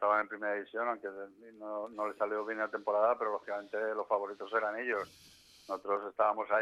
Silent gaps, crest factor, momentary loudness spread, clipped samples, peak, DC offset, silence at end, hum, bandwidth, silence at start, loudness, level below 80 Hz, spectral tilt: none; 18 dB; 12 LU; under 0.1%; -16 dBFS; under 0.1%; 0 s; none; 13 kHz; 0 s; -35 LUFS; -80 dBFS; -4.5 dB/octave